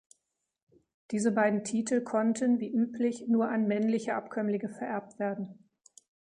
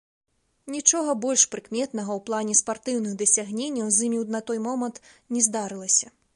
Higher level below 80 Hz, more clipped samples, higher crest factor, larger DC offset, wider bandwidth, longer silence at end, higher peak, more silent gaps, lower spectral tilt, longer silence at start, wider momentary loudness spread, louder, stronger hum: second, -78 dBFS vs -72 dBFS; neither; about the same, 18 dB vs 22 dB; neither; second, 10 kHz vs 11.5 kHz; first, 0.85 s vs 0.3 s; second, -12 dBFS vs -4 dBFS; neither; first, -6 dB/octave vs -2.5 dB/octave; first, 1.1 s vs 0.65 s; about the same, 8 LU vs 9 LU; second, -30 LUFS vs -23 LUFS; neither